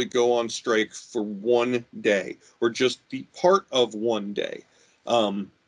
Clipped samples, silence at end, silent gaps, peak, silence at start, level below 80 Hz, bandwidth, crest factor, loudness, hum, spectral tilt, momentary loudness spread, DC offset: under 0.1%; 0.2 s; none; -6 dBFS; 0 s; -72 dBFS; 10.5 kHz; 18 dB; -25 LUFS; none; -4 dB/octave; 12 LU; under 0.1%